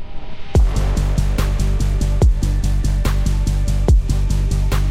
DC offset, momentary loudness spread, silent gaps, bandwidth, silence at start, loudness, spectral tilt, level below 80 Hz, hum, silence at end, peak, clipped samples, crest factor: under 0.1%; 3 LU; none; 15 kHz; 0 s; -19 LUFS; -6.5 dB/octave; -16 dBFS; none; 0 s; -2 dBFS; under 0.1%; 14 dB